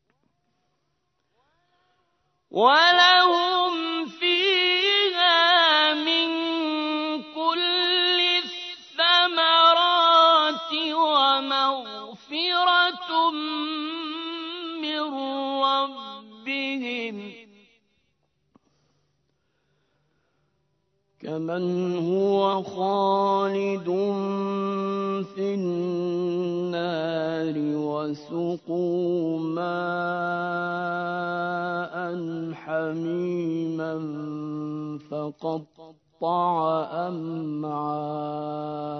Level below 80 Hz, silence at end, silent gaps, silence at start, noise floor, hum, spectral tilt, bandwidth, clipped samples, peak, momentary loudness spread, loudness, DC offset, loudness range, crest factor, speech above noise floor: -76 dBFS; 0 s; none; 2.5 s; -75 dBFS; none; -5 dB/octave; 6.4 kHz; under 0.1%; -4 dBFS; 15 LU; -23 LUFS; under 0.1%; 11 LU; 20 dB; 50 dB